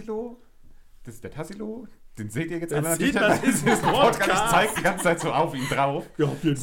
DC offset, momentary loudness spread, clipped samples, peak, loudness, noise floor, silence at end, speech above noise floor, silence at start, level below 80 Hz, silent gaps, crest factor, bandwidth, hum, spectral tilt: under 0.1%; 17 LU; under 0.1%; -6 dBFS; -23 LUFS; -47 dBFS; 0 s; 24 dB; 0 s; -48 dBFS; none; 18 dB; 17 kHz; none; -4.5 dB/octave